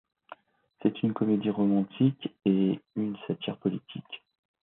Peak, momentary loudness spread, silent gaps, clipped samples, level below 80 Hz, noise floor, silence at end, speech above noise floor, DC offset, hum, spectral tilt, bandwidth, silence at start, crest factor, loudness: -12 dBFS; 14 LU; none; under 0.1%; -72 dBFS; -59 dBFS; 0.45 s; 30 dB; under 0.1%; none; -11.5 dB/octave; 4 kHz; 0.3 s; 18 dB; -29 LUFS